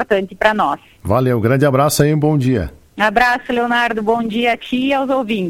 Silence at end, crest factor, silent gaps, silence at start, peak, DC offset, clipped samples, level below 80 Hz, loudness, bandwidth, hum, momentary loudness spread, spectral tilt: 0 s; 16 dB; none; 0 s; 0 dBFS; under 0.1%; under 0.1%; -40 dBFS; -16 LUFS; 16.5 kHz; none; 5 LU; -5.5 dB/octave